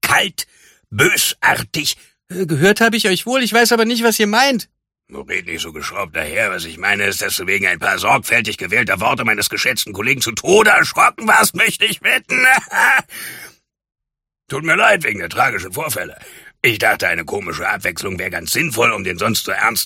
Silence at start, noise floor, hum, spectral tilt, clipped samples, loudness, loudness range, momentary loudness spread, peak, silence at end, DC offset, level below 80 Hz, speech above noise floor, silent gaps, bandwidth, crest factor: 0.05 s; -83 dBFS; none; -2.5 dB/octave; under 0.1%; -15 LUFS; 6 LU; 12 LU; 0 dBFS; 0 s; under 0.1%; -52 dBFS; 66 dB; none; 16.5 kHz; 16 dB